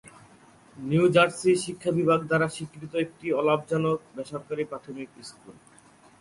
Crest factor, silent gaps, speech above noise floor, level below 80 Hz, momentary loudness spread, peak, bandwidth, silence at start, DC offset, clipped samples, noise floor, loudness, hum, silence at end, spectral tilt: 20 dB; none; 29 dB; -64 dBFS; 18 LU; -8 dBFS; 11.5 kHz; 0.05 s; under 0.1%; under 0.1%; -55 dBFS; -26 LUFS; none; 0.7 s; -5.5 dB/octave